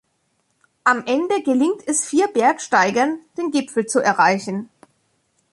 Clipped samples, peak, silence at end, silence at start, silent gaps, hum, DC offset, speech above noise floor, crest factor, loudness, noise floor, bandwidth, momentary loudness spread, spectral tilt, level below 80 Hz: under 0.1%; -2 dBFS; 0.9 s; 0.85 s; none; none; under 0.1%; 49 dB; 18 dB; -19 LUFS; -68 dBFS; 11.5 kHz; 7 LU; -3.5 dB/octave; -68 dBFS